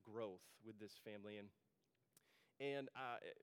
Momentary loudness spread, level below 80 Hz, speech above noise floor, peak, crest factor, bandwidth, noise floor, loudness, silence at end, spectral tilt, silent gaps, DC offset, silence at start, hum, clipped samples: 13 LU; under -90 dBFS; 28 dB; -36 dBFS; 20 dB; 17 kHz; -80 dBFS; -53 LUFS; 0.05 s; -5 dB/octave; none; under 0.1%; 0.05 s; none; under 0.1%